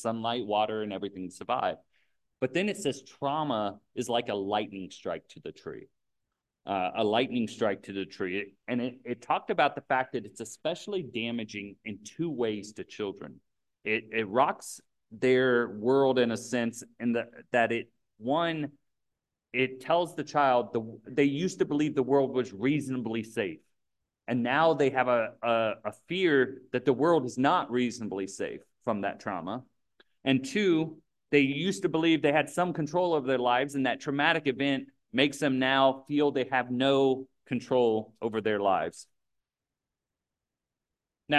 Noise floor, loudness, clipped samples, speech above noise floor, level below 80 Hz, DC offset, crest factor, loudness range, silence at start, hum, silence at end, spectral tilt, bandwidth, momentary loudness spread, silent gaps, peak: -90 dBFS; -29 LUFS; under 0.1%; 61 dB; -70 dBFS; under 0.1%; 22 dB; 6 LU; 0 s; none; 0 s; -5 dB/octave; 12.5 kHz; 13 LU; none; -8 dBFS